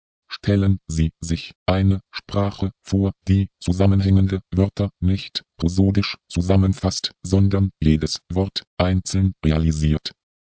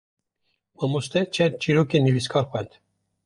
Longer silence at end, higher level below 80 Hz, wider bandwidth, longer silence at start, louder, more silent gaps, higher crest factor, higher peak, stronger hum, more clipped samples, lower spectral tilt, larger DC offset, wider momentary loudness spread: second, 0.4 s vs 0.6 s; first, -30 dBFS vs -60 dBFS; second, 8 kHz vs 11.5 kHz; second, 0.3 s vs 0.8 s; about the same, -21 LUFS vs -23 LUFS; first, 1.55-1.66 s, 8.67-8.77 s vs none; about the same, 16 dB vs 18 dB; first, -4 dBFS vs -8 dBFS; neither; neither; about the same, -6.5 dB/octave vs -6 dB/octave; neither; about the same, 8 LU vs 9 LU